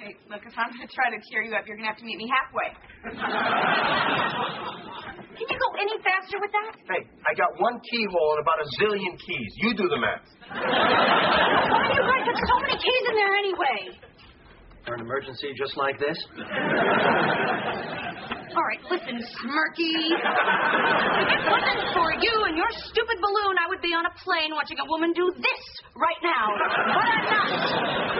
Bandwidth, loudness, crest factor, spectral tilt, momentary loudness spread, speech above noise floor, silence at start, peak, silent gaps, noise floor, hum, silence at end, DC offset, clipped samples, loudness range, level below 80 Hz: 5.8 kHz; -24 LUFS; 18 dB; -1 dB/octave; 12 LU; 25 dB; 0 s; -8 dBFS; none; -50 dBFS; none; 0 s; under 0.1%; under 0.1%; 5 LU; -56 dBFS